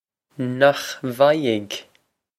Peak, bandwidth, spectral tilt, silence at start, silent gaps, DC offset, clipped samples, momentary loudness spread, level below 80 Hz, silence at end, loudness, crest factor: 0 dBFS; 15.5 kHz; -5 dB/octave; 0.4 s; none; under 0.1%; under 0.1%; 13 LU; -70 dBFS; 0.55 s; -20 LUFS; 20 dB